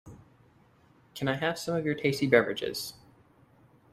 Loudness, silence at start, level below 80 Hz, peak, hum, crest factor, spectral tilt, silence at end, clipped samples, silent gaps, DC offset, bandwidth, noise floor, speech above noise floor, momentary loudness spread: -29 LUFS; 0.05 s; -66 dBFS; -6 dBFS; none; 26 dB; -5 dB/octave; 1 s; under 0.1%; none; under 0.1%; 15.5 kHz; -62 dBFS; 33 dB; 13 LU